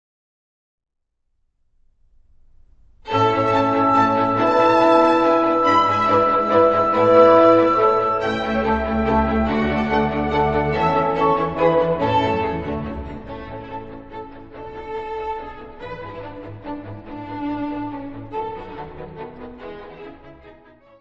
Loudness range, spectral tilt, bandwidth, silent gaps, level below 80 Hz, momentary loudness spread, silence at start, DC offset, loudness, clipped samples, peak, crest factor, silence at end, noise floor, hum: 17 LU; -7 dB/octave; 7.6 kHz; none; -40 dBFS; 21 LU; 3.05 s; under 0.1%; -18 LUFS; under 0.1%; -2 dBFS; 18 dB; 0.5 s; -72 dBFS; none